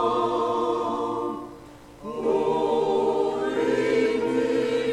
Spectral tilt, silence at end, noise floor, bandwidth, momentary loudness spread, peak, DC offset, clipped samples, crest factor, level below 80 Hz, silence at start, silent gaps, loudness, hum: -5.5 dB/octave; 0 s; -45 dBFS; 11.5 kHz; 9 LU; -12 dBFS; under 0.1%; under 0.1%; 12 dB; -56 dBFS; 0 s; none; -24 LUFS; none